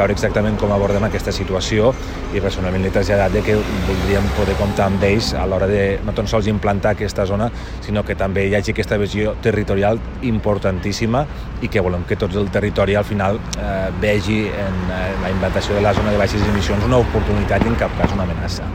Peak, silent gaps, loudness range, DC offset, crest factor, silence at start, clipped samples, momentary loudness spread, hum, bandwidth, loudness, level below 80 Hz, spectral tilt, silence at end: 0 dBFS; none; 2 LU; under 0.1%; 16 dB; 0 s; under 0.1%; 5 LU; none; 16 kHz; -18 LUFS; -28 dBFS; -6.5 dB/octave; 0 s